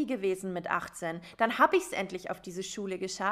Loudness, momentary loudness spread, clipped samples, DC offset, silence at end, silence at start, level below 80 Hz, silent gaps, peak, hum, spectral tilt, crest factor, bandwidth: -31 LUFS; 13 LU; under 0.1%; under 0.1%; 0 s; 0 s; -68 dBFS; none; -10 dBFS; none; -4 dB/octave; 22 dB; 15.5 kHz